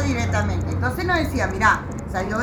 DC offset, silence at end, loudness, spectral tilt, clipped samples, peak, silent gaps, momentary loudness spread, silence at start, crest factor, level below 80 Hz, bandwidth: under 0.1%; 0 s; -22 LUFS; -5.5 dB/octave; under 0.1%; -4 dBFS; none; 6 LU; 0 s; 18 dB; -34 dBFS; 19.5 kHz